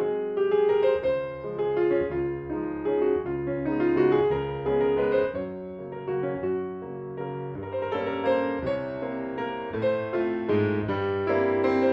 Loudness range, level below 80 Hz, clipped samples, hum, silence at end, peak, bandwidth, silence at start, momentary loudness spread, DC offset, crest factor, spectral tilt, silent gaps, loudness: 4 LU; -52 dBFS; under 0.1%; none; 0 s; -12 dBFS; 5.6 kHz; 0 s; 11 LU; under 0.1%; 14 dB; -9 dB/octave; none; -27 LUFS